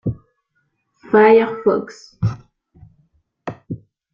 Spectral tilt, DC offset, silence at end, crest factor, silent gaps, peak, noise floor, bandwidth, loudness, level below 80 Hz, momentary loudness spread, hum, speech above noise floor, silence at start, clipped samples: -8 dB/octave; under 0.1%; 0.35 s; 18 dB; none; -2 dBFS; -69 dBFS; 7.2 kHz; -16 LUFS; -50 dBFS; 24 LU; none; 54 dB; 0.05 s; under 0.1%